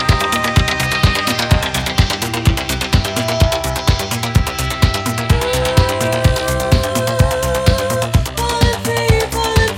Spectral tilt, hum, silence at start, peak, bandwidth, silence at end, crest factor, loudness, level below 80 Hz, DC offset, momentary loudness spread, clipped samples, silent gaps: -4.5 dB/octave; none; 0 s; 0 dBFS; 17 kHz; 0 s; 16 dB; -16 LUFS; -22 dBFS; under 0.1%; 3 LU; under 0.1%; none